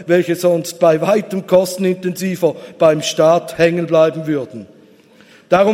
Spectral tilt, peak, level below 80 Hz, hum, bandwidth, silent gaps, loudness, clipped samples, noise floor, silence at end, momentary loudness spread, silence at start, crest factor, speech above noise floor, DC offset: -5.5 dB/octave; 0 dBFS; -58 dBFS; none; 16.5 kHz; none; -15 LUFS; under 0.1%; -46 dBFS; 0 s; 7 LU; 0 s; 16 dB; 31 dB; under 0.1%